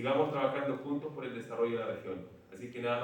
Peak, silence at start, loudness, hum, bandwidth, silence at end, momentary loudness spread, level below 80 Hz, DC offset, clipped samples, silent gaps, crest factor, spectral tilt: -18 dBFS; 0 s; -36 LUFS; none; 17 kHz; 0 s; 14 LU; -78 dBFS; under 0.1%; under 0.1%; none; 18 dB; -7 dB/octave